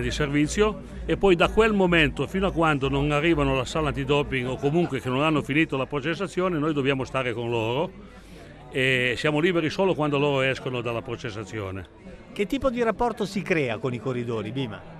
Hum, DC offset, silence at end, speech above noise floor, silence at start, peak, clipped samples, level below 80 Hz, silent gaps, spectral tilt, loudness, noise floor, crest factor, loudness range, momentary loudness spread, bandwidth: none; under 0.1%; 0 s; 20 dB; 0 s; -6 dBFS; under 0.1%; -42 dBFS; none; -6 dB/octave; -24 LUFS; -44 dBFS; 18 dB; 5 LU; 11 LU; 13.5 kHz